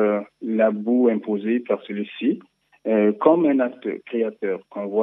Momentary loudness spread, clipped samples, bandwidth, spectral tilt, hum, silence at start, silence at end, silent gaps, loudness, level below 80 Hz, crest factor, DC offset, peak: 11 LU; under 0.1%; 3.9 kHz; -10 dB/octave; none; 0 s; 0 s; none; -22 LUFS; -84 dBFS; 20 dB; under 0.1%; 0 dBFS